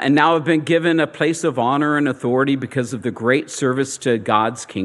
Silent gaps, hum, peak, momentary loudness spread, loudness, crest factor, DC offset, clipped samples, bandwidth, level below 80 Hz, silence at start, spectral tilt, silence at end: none; none; 0 dBFS; 6 LU; -18 LUFS; 18 dB; under 0.1%; under 0.1%; 12 kHz; -66 dBFS; 0 s; -5 dB/octave; 0 s